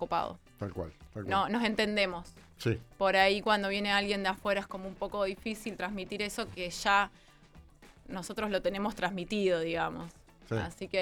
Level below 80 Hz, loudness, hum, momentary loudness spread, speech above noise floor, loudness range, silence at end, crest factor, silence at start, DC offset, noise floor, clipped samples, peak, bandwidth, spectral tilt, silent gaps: -56 dBFS; -32 LUFS; none; 14 LU; 25 dB; 5 LU; 0 s; 22 dB; 0 s; under 0.1%; -57 dBFS; under 0.1%; -10 dBFS; 18.5 kHz; -4.5 dB/octave; none